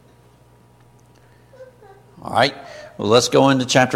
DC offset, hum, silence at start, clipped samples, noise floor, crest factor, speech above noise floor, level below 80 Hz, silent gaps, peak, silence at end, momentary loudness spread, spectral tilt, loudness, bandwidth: under 0.1%; none; 1.6 s; under 0.1%; -51 dBFS; 20 dB; 34 dB; -56 dBFS; none; 0 dBFS; 0 s; 23 LU; -4 dB/octave; -17 LUFS; 15.5 kHz